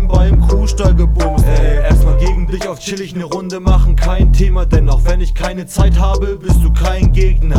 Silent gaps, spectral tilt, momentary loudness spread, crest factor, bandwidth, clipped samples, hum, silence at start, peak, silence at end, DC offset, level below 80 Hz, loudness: none; -6.5 dB/octave; 9 LU; 10 dB; 13 kHz; under 0.1%; none; 0 s; 0 dBFS; 0 s; under 0.1%; -12 dBFS; -14 LUFS